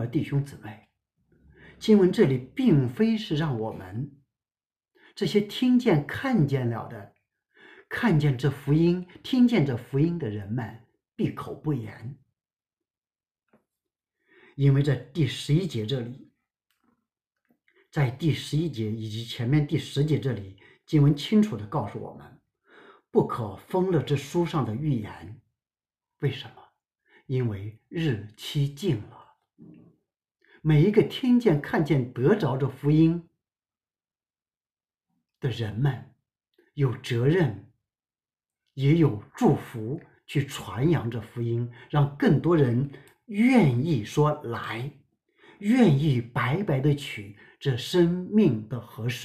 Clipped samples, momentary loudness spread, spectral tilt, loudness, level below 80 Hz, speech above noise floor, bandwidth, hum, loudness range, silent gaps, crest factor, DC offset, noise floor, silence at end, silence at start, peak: under 0.1%; 14 LU; -7.5 dB/octave; -26 LUFS; -54 dBFS; over 65 dB; 14 kHz; none; 8 LU; 13.31-13.35 s; 20 dB; under 0.1%; under -90 dBFS; 0 s; 0 s; -6 dBFS